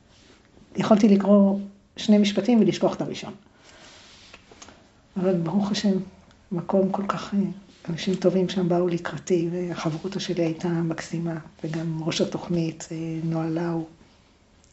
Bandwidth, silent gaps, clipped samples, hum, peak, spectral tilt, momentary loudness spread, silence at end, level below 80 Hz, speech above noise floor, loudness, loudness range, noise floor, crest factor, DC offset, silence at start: 8.2 kHz; none; under 0.1%; none; -4 dBFS; -6.5 dB/octave; 14 LU; 0.85 s; -60 dBFS; 34 dB; -24 LUFS; 7 LU; -57 dBFS; 20 dB; under 0.1%; 0.75 s